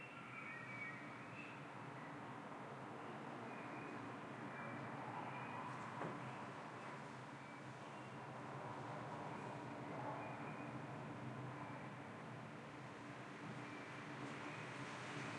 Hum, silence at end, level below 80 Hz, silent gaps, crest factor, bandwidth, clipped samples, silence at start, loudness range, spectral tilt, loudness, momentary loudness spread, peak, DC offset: none; 0 s; -86 dBFS; none; 18 dB; 11.5 kHz; under 0.1%; 0 s; 2 LU; -6 dB/octave; -51 LUFS; 4 LU; -32 dBFS; under 0.1%